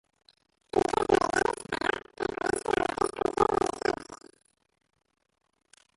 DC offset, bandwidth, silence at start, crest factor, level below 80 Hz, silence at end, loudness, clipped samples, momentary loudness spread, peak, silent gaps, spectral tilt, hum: under 0.1%; 11.5 kHz; 0.75 s; 22 dB; -56 dBFS; 1.8 s; -29 LUFS; under 0.1%; 8 LU; -10 dBFS; none; -4 dB/octave; none